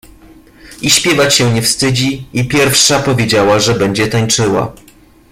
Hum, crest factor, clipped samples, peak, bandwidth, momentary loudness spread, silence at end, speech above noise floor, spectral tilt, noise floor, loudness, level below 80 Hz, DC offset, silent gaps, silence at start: none; 12 dB; under 0.1%; 0 dBFS; 16.5 kHz; 7 LU; 0.6 s; 29 dB; -3.5 dB/octave; -40 dBFS; -11 LUFS; -40 dBFS; under 0.1%; none; 0.65 s